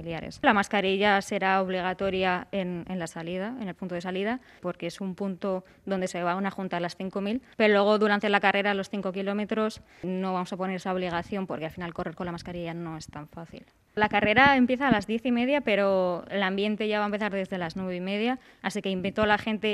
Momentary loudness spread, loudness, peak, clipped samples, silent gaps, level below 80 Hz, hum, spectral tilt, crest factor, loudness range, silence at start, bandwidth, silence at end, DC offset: 12 LU; -27 LUFS; -4 dBFS; under 0.1%; none; -58 dBFS; none; -5.5 dB/octave; 22 dB; 8 LU; 0 s; 12.5 kHz; 0 s; under 0.1%